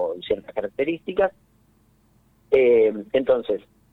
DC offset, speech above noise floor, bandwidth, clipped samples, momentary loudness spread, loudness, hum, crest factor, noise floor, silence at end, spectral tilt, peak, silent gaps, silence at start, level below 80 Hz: under 0.1%; 39 dB; 4.1 kHz; under 0.1%; 11 LU; -22 LUFS; none; 16 dB; -60 dBFS; 0.35 s; -7.5 dB/octave; -6 dBFS; none; 0 s; -56 dBFS